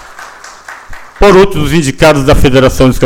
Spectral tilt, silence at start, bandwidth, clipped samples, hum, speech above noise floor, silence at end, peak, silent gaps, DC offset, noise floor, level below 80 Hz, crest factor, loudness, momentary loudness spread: -5.5 dB/octave; 0.1 s; 17.5 kHz; 1%; none; 24 dB; 0 s; 0 dBFS; none; under 0.1%; -30 dBFS; -18 dBFS; 8 dB; -7 LUFS; 23 LU